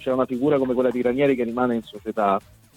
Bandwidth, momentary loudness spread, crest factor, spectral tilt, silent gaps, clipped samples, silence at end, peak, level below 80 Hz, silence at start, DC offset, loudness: 15.5 kHz; 6 LU; 16 dB; -7.5 dB/octave; none; under 0.1%; 0.35 s; -6 dBFS; -56 dBFS; 0 s; under 0.1%; -22 LUFS